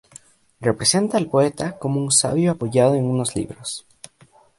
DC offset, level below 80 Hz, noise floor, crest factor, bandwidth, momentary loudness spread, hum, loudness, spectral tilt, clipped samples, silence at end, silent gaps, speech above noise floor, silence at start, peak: under 0.1%; -54 dBFS; -54 dBFS; 20 dB; 11.5 kHz; 12 LU; none; -20 LUFS; -4.5 dB/octave; under 0.1%; 0.8 s; none; 34 dB; 0.6 s; -2 dBFS